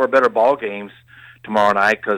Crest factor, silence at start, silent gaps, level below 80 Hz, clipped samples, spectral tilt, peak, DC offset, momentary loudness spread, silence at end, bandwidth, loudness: 14 dB; 0 s; none; -60 dBFS; under 0.1%; -5 dB/octave; -4 dBFS; under 0.1%; 15 LU; 0 s; 13.5 kHz; -17 LUFS